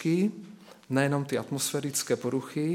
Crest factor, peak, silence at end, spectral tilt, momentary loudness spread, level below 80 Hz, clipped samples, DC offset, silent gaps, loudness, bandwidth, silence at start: 20 dB; -10 dBFS; 0 s; -5 dB/octave; 5 LU; -74 dBFS; under 0.1%; under 0.1%; none; -29 LUFS; 17 kHz; 0 s